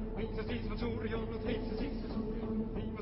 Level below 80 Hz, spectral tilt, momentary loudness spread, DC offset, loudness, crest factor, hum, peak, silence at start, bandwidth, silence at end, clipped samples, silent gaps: -44 dBFS; -6.5 dB/octave; 2 LU; under 0.1%; -38 LUFS; 14 dB; none; -24 dBFS; 0 s; 5.6 kHz; 0 s; under 0.1%; none